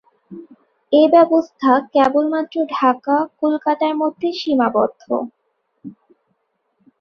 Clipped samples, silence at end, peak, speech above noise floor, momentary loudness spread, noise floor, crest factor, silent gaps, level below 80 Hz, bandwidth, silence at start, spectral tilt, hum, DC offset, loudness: under 0.1%; 1.1 s; -2 dBFS; 52 dB; 10 LU; -69 dBFS; 16 dB; none; -64 dBFS; 6.8 kHz; 0.3 s; -6 dB/octave; none; under 0.1%; -17 LUFS